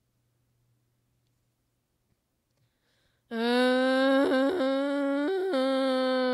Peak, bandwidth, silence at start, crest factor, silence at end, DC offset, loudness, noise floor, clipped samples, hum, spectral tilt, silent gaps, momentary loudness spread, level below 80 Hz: -12 dBFS; 13 kHz; 3.3 s; 16 dB; 0 s; under 0.1%; -26 LUFS; -76 dBFS; under 0.1%; none; -4 dB/octave; none; 5 LU; -82 dBFS